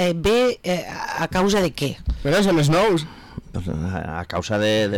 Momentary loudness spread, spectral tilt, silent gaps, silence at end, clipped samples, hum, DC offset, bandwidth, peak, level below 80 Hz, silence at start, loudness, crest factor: 11 LU; -5.5 dB/octave; none; 0 s; under 0.1%; none; under 0.1%; 18 kHz; -12 dBFS; -36 dBFS; 0 s; -21 LUFS; 8 dB